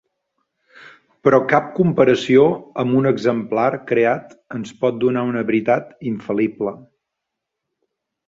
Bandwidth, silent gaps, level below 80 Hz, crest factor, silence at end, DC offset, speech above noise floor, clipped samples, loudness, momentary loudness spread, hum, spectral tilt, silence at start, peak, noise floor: 7.8 kHz; none; -60 dBFS; 20 dB; 1.5 s; under 0.1%; 63 dB; under 0.1%; -18 LUFS; 12 LU; none; -7.5 dB/octave; 0.85 s; 0 dBFS; -80 dBFS